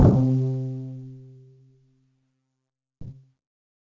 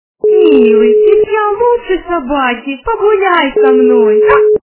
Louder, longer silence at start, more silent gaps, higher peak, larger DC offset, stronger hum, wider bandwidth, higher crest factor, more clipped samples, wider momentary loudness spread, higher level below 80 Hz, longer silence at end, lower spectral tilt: second, -24 LUFS vs -9 LUFS; second, 0 s vs 0.25 s; neither; second, -4 dBFS vs 0 dBFS; neither; neither; first, 7 kHz vs 4 kHz; first, 22 dB vs 8 dB; second, under 0.1% vs 0.4%; first, 25 LU vs 8 LU; about the same, -38 dBFS vs -40 dBFS; first, 0.8 s vs 0.1 s; first, -11 dB/octave vs -8.5 dB/octave